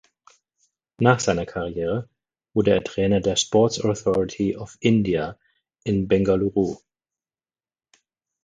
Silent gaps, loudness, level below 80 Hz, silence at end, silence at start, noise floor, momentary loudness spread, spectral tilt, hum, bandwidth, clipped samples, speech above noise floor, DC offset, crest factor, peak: none; -22 LUFS; -48 dBFS; 1.7 s; 1 s; under -90 dBFS; 8 LU; -5.5 dB/octave; none; 9.6 kHz; under 0.1%; over 69 dB; under 0.1%; 22 dB; 0 dBFS